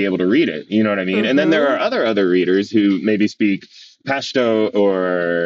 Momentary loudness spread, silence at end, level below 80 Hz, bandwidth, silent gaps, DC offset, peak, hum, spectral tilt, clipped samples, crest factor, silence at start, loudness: 4 LU; 0 s; -66 dBFS; 7.6 kHz; none; under 0.1%; -2 dBFS; none; -6 dB/octave; under 0.1%; 14 dB; 0 s; -17 LUFS